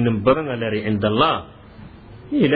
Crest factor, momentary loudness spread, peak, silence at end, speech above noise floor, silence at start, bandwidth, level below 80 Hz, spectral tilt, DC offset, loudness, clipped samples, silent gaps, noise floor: 16 dB; 9 LU; -4 dBFS; 0 s; 22 dB; 0 s; 4.9 kHz; -46 dBFS; -10 dB/octave; under 0.1%; -20 LUFS; under 0.1%; none; -41 dBFS